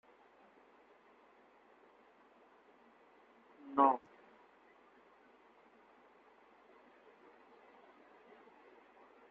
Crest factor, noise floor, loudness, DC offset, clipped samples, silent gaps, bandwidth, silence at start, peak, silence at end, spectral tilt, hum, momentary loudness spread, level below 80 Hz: 28 dB; -66 dBFS; -33 LUFS; under 0.1%; under 0.1%; none; 5.4 kHz; 3.65 s; -16 dBFS; 5.35 s; -3.5 dB/octave; none; 32 LU; under -90 dBFS